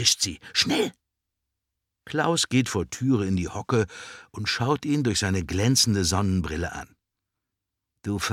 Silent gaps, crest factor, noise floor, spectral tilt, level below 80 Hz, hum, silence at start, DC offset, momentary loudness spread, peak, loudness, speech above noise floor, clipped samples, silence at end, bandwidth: none; 22 dB; -84 dBFS; -4 dB/octave; -48 dBFS; none; 0 s; under 0.1%; 10 LU; -6 dBFS; -25 LUFS; 60 dB; under 0.1%; 0 s; 16.5 kHz